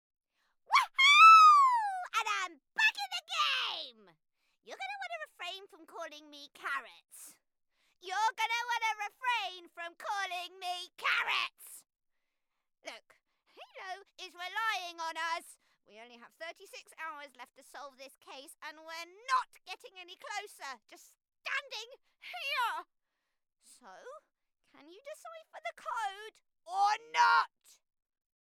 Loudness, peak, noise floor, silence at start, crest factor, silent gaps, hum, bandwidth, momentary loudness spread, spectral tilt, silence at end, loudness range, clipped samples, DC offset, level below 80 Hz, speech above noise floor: -29 LUFS; -10 dBFS; -84 dBFS; 0.7 s; 24 dB; none; none; 16 kHz; 23 LU; 2.5 dB/octave; 1.05 s; 19 LU; under 0.1%; under 0.1%; under -90 dBFS; 46 dB